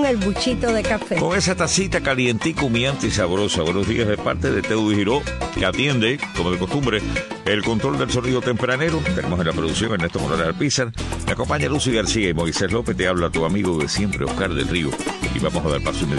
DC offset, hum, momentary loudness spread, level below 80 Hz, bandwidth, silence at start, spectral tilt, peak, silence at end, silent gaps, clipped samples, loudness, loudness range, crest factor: under 0.1%; none; 4 LU; -36 dBFS; 12 kHz; 0 s; -4.5 dB/octave; -6 dBFS; 0 s; none; under 0.1%; -21 LUFS; 2 LU; 16 dB